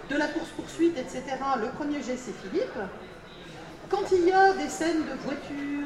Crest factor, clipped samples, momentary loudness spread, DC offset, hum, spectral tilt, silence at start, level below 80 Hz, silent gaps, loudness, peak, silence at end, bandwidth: 18 dB; under 0.1%; 21 LU; under 0.1%; none; -4.5 dB/octave; 0 s; -54 dBFS; none; -28 LUFS; -10 dBFS; 0 s; 12.5 kHz